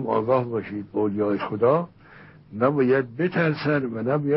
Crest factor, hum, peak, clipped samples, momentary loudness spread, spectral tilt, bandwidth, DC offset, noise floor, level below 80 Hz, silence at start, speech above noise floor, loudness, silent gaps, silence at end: 16 dB; none; -8 dBFS; under 0.1%; 8 LU; -12 dB/octave; 5.8 kHz; under 0.1%; -48 dBFS; -62 dBFS; 0 s; 25 dB; -23 LUFS; none; 0 s